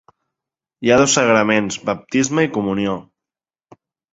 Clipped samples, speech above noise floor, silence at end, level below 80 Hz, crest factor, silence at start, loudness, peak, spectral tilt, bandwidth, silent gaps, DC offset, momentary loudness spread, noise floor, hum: under 0.1%; 73 dB; 1.1 s; -54 dBFS; 18 dB; 0.8 s; -17 LUFS; -2 dBFS; -4 dB/octave; 8.2 kHz; none; under 0.1%; 10 LU; -90 dBFS; none